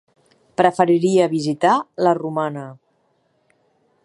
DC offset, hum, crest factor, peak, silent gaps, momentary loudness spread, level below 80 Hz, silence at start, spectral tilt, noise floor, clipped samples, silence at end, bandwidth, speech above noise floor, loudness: under 0.1%; none; 20 dB; 0 dBFS; none; 13 LU; -70 dBFS; 0.6 s; -6 dB/octave; -64 dBFS; under 0.1%; 1.3 s; 11.5 kHz; 47 dB; -18 LUFS